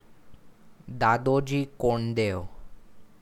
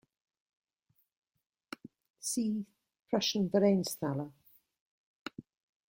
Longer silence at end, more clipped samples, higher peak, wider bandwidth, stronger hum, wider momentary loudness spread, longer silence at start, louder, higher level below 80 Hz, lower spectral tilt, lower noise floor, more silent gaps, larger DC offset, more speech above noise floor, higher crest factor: second, 0.15 s vs 0.45 s; neither; first, -10 dBFS vs -16 dBFS; about the same, 15.5 kHz vs 16.5 kHz; neither; second, 14 LU vs 21 LU; second, 0.1 s vs 2.25 s; first, -26 LUFS vs -32 LUFS; first, -48 dBFS vs -76 dBFS; first, -7 dB/octave vs -5 dB/octave; second, -51 dBFS vs -77 dBFS; second, none vs 2.99-3.03 s, 4.80-5.26 s; neither; second, 25 dB vs 46 dB; about the same, 20 dB vs 20 dB